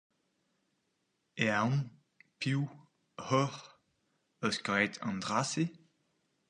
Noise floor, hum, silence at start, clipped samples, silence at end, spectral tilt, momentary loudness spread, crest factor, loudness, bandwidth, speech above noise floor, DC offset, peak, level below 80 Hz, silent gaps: -80 dBFS; none; 1.35 s; under 0.1%; 0.75 s; -5 dB/octave; 15 LU; 24 dB; -33 LUFS; 10.5 kHz; 47 dB; under 0.1%; -14 dBFS; -74 dBFS; none